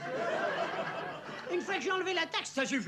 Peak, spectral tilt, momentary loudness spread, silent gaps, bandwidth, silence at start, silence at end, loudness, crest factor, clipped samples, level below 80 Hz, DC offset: -20 dBFS; -3 dB/octave; 7 LU; none; 13 kHz; 0 s; 0 s; -34 LUFS; 16 dB; under 0.1%; -84 dBFS; under 0.1%